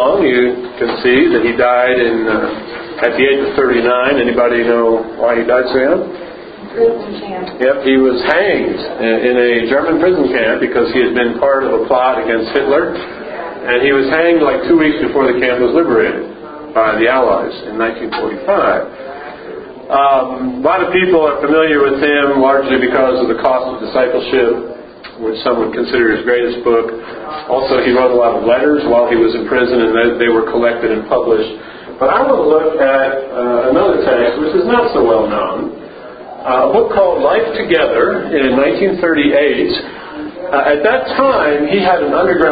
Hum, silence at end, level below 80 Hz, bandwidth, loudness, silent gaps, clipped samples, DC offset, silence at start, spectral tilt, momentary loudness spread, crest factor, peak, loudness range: none; 0 s; -44 dBFS; 5 kHz; -13 LUFS; none; under 0.1%; under 0.1%; 0 s; -8.5 dB/octave; 12 LU; 12 dB; 0 dBFS; 3 LU